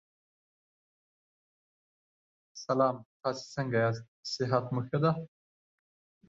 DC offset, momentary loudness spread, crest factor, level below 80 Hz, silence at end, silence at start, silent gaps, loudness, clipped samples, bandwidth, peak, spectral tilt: under 0.1%; 11 LU; 20 dB; -72 dBFS; 1 s; 2.55 s; 3.05-3.20 s, 4.08-4.23 s; -32 LUFS; under 0.1%; 7.8 kHz; -14 dBFS; -6.5 dB/octave